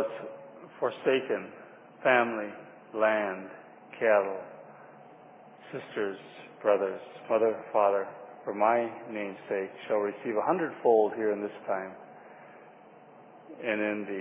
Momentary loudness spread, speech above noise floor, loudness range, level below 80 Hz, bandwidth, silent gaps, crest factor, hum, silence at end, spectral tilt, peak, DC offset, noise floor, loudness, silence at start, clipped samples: 22 LU; 24 dB; 4 LU; -86 dBFS; 3.9 kHz; none; 20 dB; none; 0 s; -8.5 dB/octave; -10 dBFS; under 0.1%; -53 dBFS; -29 LUFS; 0 s; under 0.1%